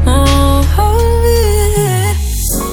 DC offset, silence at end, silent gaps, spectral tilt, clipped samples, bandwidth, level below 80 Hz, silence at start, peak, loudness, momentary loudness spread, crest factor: under 0.1%; 0 s; none; -5 dB/octave; under 0.1%; 18.5 kHz; -14 dBFS; 0 s; 0 dBFS; -12 LUFS; 5 LU; 10 dB